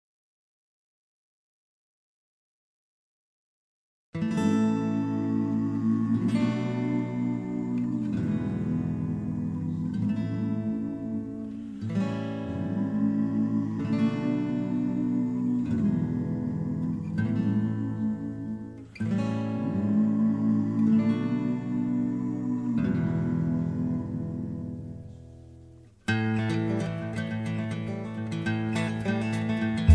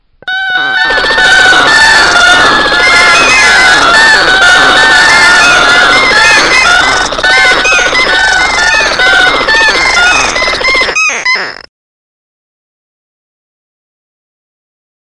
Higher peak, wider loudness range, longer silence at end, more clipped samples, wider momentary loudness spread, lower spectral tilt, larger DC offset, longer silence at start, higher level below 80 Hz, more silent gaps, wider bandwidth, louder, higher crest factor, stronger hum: second, -6 dBFS vs 0 dBFS; second, 5 LU vs 8 LU; second, 0 s vs 3.5 s; second, under 0.1% vs 3%; about the same, 8 LU vs 6 LU; first, -8 dB/octave vs -0.5 dB/octave; second, under 0.1% vs 0.6%; first, 4.15 s vs 0.25 s; second, -56 dBFS vs -32 dBFS; neither; second, 10 kHz vs 12 kHz; second, -28 LUFS vs -4 LUFS; first, 22 dB vs 6 dB; neither